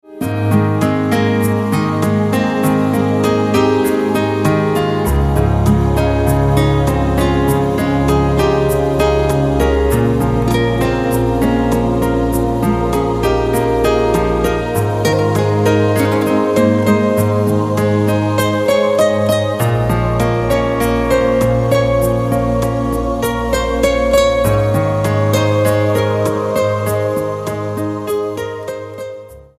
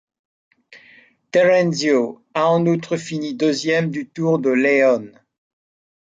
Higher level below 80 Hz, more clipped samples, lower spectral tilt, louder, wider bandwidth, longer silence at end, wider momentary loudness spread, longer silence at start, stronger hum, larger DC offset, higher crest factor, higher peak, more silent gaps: first, -26 dBFS vs -68 dBFS; neither; about the same, -6.5 dB/octave vs -5.5 dB/octave; first, -15 LUFS vs -18 LUFS; first, 15.5 kHz vs 9.2 kHz; second, 0.15 s vs 0.95 s; second, 4 LU vs 9 LU; second, 0.1 s vs 0.7 s; neither; neither; about the same, 14 dB vs 16 dB; first, 0 dBFS vs -4 dBFS; neither